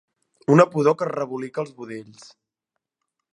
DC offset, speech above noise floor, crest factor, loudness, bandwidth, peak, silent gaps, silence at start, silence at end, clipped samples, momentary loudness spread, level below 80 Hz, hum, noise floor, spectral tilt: under 0.1%; 61 dB; 22 dB; -21 LUFS; 11 kHz; -2 dBFS; none; 0.5 s; 1.3 s; under 0.1%; 20 LU; -74 dBFS; none; -83 dBFS; -7.5 dB/octave